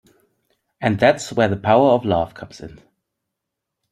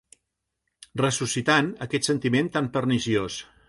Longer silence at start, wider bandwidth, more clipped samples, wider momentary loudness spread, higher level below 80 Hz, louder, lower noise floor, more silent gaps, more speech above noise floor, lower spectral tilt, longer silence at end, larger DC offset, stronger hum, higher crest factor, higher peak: second, 0.8 s vs 0.95 s; first, 13 kHz vs 11.5 kHz; neither; first, 21 LU vs 6 LU; about the same, -54 dBFS vs -58 dBFS; first, -18 LUFS vs -24 LUFS; about the same, -81 dBFS vs -80 dBFS; neither; first, 63 dB vs 56 dB; first, -6 dB/octave vs -4.5 dB/octave; first, 1.25 s vs 0.25 s; neither; neither; about the same, 20 dB vs 20 dB; first, 0 dBFS vs -6 dBFS